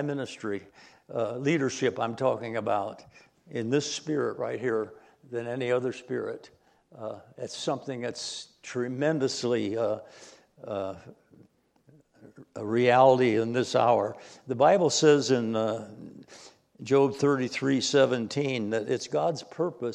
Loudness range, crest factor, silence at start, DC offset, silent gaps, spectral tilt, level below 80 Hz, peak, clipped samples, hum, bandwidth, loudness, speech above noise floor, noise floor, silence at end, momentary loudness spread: 10 LU; 22 dB; 0 s; under 0.1%; none; -5 dB/octave; -76 dBFS; -6 dBFS; under 0.1%; none; 11 kHz; -27 LUFS; 35 dB; -62 dBFS; 0 s; 17 LU